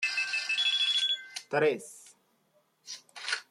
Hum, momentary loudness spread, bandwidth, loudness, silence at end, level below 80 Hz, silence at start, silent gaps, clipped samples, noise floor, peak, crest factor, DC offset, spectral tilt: none; 19 LU; 14 kHz; -28 LUFS; 0.1 s; -86 dBFS; 0 s; none; under 0.1%; -71 dBFS; -14 dBFS; 18 dB; under 0.1%; -1.5 dB/octave